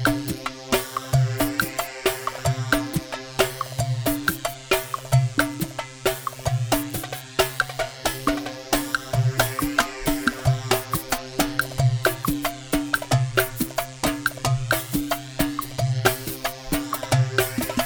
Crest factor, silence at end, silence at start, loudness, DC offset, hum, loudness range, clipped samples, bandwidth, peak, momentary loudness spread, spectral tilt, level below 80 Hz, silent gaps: 22 dB; 0 s; 0 s; -24 LUFS; under 0.1%; none; 2 LU; under 0.1%; over 20 kHz; -2 dBFS; 6 LU; -4.5 dB/octave; -42 dBFS; none